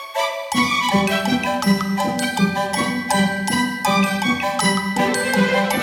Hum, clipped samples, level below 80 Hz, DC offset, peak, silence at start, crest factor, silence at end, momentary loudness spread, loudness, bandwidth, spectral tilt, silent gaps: none; under 0.1%; -56 dBFS; under 0.1%; -2 dBFS; 0 s; 16 dB; 0 s; 3 LU; -19 LUFS; 18.5 kHz; -4 dB/octave; none